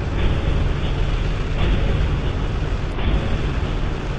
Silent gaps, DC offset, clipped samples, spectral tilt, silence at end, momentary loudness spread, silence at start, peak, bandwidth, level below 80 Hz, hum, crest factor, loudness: none; under 0.1%; under 0.1%; -7 dB/octave; 0 s; 3 LU; 0 s; -6 dBFS; 8.2 kHz; -22 dBFS; none; 14 dB; -23 LUFS